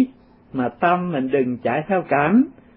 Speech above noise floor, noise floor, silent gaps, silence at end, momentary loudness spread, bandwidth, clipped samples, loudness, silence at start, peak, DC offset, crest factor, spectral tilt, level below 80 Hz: 22 dB; -41 dBFS; none; 0.25 s; 9 LU; 3.9 kHz; under 0.1%; -20 LUFS; 0 s; -4 dBFS; under 0.1%; 16 dB; -12 dB/octave; -58 dBFS